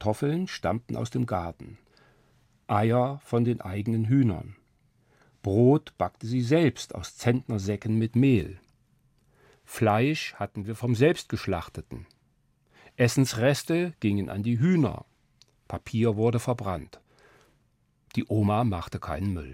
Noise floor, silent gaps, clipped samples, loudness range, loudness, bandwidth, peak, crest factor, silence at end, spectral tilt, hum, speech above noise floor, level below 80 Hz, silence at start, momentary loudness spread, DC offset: -68 dBFS; none; under 0.1%; 3 LU; -27 LUFS; 16 kHz; -8 dBFS; 20 dB; 0 s; -7 dB/octave; none; 42 dB; -56 dBFS; 0 s; 14 LU; under 0.1%